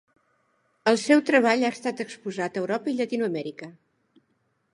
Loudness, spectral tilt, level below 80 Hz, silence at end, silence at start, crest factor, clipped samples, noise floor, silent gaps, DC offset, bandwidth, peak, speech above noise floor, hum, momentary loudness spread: -24 LUFS; -4.5 dB/octave; -80 dBFS; 1.05 s; 0.85 s; 20 dB; under 0.1%; -72 dBFS; none; under 0.1%; 11.5 kHz; -6 dBFS; 47 dB; none; 14 LU